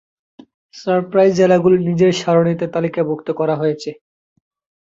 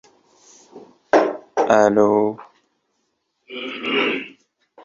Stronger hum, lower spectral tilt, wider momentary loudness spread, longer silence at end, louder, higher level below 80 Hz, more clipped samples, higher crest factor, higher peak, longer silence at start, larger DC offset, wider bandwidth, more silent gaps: neither; first, -7 dB/octave vs -4.5 dB/octave; second, 8 LU vs 18 LU; first, 0.9 s vs 0.05 s; first, -16 LUFS vs -19 LUFS; first, -58 dBFS vs -64 dBFS; neither; about the same, 16 dB vs 20 dB; about the same, -2 dBFS vs -2 dBFS; about the same, 0.75 s vs 0.75 s; neither; about the same, 7.8 kHz vs 7.6 kHz; neither